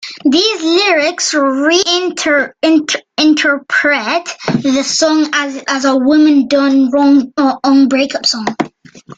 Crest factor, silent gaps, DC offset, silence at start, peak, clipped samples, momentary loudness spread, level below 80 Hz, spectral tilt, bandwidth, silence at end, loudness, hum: 12 dB; none; under 0.1%; 0 s; 0 dBFS; under 0.1%; 7 LU; -56 dBFS; -3 dB/octave; 9.2 kHz; 0.05 s; -12 LUFS; none